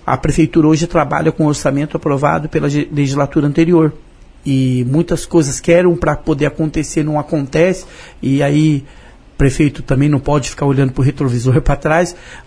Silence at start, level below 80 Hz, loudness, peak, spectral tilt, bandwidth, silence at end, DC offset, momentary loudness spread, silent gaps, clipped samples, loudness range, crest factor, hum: 0.05 s; -30 dBFS; -14 LUFS; 0 dBFS; -6.5 dB/octave; 11 kHz; 0.05 s; under 0.1%; 6 LU; none; under 0.1%; 2 LU; 14 dB; none